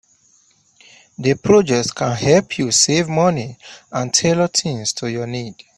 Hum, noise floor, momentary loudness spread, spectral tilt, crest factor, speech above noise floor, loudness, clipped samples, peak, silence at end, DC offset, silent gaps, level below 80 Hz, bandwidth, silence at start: none; -56 dBFS; 12 LU; -4 dB/octave; 18 dB; 39 dB; -17 LUFS; under 0.1%; 0 dBFS; 0.25 s; under 0.1%; none; -52 dBFS; 12 kHz; 1.2 s